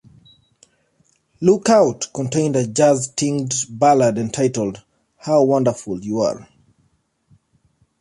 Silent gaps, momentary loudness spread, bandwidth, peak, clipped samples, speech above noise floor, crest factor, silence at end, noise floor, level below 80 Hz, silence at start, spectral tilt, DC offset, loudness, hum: none; 11 LU; 11.5 kHz; -2 dBFS; under 0.1%; 47 dB; 16 dB; 1.6 s; -64 dBFS; -58 dBFS; 1.4 s; -5.5 dB/octave; under 0.1%; -18 LUFS; none